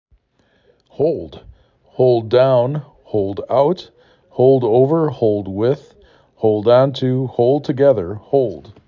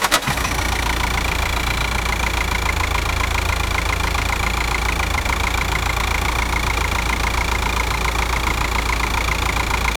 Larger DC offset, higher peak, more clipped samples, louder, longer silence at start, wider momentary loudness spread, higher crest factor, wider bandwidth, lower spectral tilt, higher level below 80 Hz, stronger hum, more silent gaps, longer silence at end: neither; about the same, -2 dBFS vs 0 dBFS; neither; first, -16 LUFS vs -20 LUFS; first, 1 s vs 0 s; first, 11 LU vs 1 LU; about the same, 16 dB vs 20 dB; second, 6.8 kHz vs 20 kHz; first, -9.5 dB/octave vs -3 dB/octave; second, -50 dBFS vs -24 dBFS; neither; neither; about the same, 0.15 s vs 0.05 s